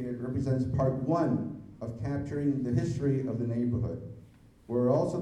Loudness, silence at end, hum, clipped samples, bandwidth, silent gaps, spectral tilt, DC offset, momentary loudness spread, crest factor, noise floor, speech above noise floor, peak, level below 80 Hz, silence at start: -30 LUFS; 0 s; none; under 0.1%; 10 kHz; none; -9.5 dB/octave; under 0.1%; 13 LU; 16 dB; -54 dBFS; 25 dB; -14 dBFS; -52 dBFS; 0 s